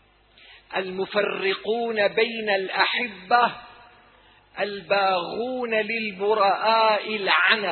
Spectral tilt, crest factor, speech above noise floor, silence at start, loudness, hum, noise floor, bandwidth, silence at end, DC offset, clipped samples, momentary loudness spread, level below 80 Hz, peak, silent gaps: -6.5 dB/octave; 22 dB; 32 dB; 0.5 s; -23 LUFS; none; -55 dBFS; 4.5 kHz; 0 s; under 0.1%; under 0.1%; 10 LU; -68 dBFS; -2 dBFS; none